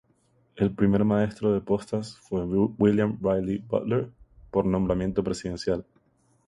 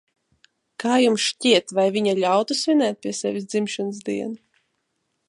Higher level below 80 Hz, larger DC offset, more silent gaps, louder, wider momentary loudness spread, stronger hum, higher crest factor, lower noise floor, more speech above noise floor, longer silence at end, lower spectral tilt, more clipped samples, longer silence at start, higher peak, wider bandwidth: first, -48 dBFS vs -74 dBFS; neither; neither; second, -26 LUFS vs -21 LUFS; about the same, 9 LU vs 11 LU; neither; about the same, 18 dB vs 18 dB; second, -66 dBFS vs -74 dBFS; second, 41 dB vs 53 dB; second, 0.65 s vs 0.95 s; first, -8 dB/octave vs -3.5 dB/octave; neither; second, 0.55 s vs 0.8 s; second, -8 dBFS vs -4 dBFS; about the same, 11 kHz vs 11.5 kHz